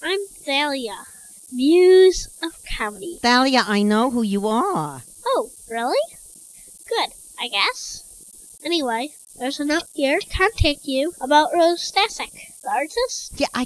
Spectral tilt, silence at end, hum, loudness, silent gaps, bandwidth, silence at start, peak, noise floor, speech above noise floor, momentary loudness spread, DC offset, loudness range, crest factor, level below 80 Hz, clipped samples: -4 dB/octave; 0 s; none; -20 LUFS; none; 11 kHz; 0 s; -2 dBFS; -43 dBFS; 23 dB; 17 LU; under 0.1%; 7 LU; 18 dB; -40 dBFS; under 0.1%